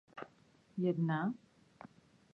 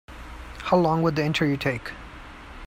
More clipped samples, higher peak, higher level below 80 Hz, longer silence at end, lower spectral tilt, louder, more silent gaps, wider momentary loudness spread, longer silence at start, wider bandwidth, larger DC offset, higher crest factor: neither; second, -22 dBFS vs -6 dBFS; second, -82 dBFS vs -44 dBFS; first, 0.5 s vs 0 s; first, -9.5 dB/octave vs -6.5 dB/octave; second, -37 LUFS vs -24 LUFS; neither; first, 24 LU vs 21 LU; about the same, 0.15 s vs 0.1 s; second, 6 kHz vs 16 kHz; neither; about the same, 18 dB vs 20 dB